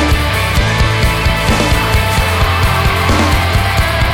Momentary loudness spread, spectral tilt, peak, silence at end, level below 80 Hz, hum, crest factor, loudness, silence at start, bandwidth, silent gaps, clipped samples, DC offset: 1 LU; -4.5 dB/octave; 0 dBFS; 0 s; -18 dBFS; none; 12 dB; -12 LUFS; 0 s; 17.5 kHz; none; under 0.1%; 0.1%